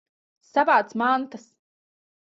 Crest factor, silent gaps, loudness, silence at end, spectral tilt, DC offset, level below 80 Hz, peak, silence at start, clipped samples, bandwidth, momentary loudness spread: 20 dB; none; -22 LUFS; 0.85 s; -5 dB/octave; under 0.1%; -76 dBFS; -6 dBFS; 0.55 s; under 0.1%; 7.8 kHz; 7 LU